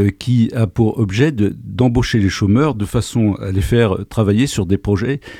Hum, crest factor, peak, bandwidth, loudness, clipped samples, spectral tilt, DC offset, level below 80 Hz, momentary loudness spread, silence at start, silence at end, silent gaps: none; 14 dB; -2 dBFS; 14.5 kHz; -16 LUFS; under 0.1%; -7 dB/octave; under 0.1%; -34 dBFS; 4 LU; 0 s; 0 s; none